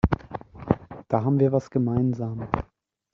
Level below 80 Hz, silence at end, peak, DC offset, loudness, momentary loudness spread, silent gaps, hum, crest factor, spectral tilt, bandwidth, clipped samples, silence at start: -40 dBFS; 0.5 s; -4 dBFS; under 0.1%; -25 LUFS; 12 LU; none; none; 22 dB; -9.5 dB/octave; 7 kHz; under 0.1%; 0.05 s